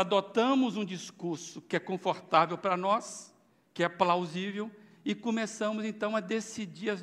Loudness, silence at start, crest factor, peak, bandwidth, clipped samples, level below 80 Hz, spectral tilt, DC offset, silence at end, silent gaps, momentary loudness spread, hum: -31 LUFS; 0 s; 22 dB; -10 dBFS; 12.5 kHz; under 0.1%; -84 dBFS; -5 dB/octave; under 0.1%; 0 s; none; 13 LU; none